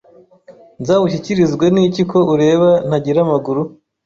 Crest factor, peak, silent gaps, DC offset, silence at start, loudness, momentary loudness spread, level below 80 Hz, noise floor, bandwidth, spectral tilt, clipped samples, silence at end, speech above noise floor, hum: 12 dB; -2 dBFS; none; under 0.1%; 0.5 s; -14 LUFS; 8 LU; -52 dBFS; -44 dBFS; 7.6 kHz; -7.5 dB/octave; under 0.1%; 0.4 s; 30 dB; none